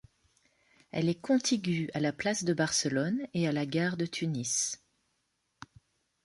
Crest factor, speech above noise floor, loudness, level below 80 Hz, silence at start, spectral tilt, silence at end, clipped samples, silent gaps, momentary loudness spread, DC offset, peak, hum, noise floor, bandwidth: 18 dB; 48 dB; -31 LUFS; -68 dBFS; 0.95 s; -4 dB/octave; 1.5 s; under 0.1%; none; 5 LU; under 0.1%; -16 dBFS; none; -78 dBFS; 11.5 kHz